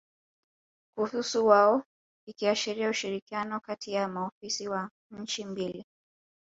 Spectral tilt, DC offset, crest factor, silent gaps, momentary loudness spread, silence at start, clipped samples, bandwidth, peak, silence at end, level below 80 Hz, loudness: -3.5 dB/octave; under 0.1%; 22 dB; 1.86-2.27 s, 3.22-3.27 s, 4.32-4.41 s, 4.91-5.10 s; 14 LU; 0.95 s; under 0.1%; 8 kHz; -8 dBFS; 0.7 s; -76 dBFS; -29 LUFS